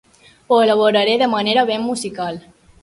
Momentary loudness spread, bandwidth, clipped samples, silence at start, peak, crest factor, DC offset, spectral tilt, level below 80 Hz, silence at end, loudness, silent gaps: 12 LU; 11.5 kHz; under 0.1%; 0.5 s; -2 dBFS; 16 dB; under 0.1%; -4 dB/octave; -60 dBFS; 0.45 s; -17 LUFS; none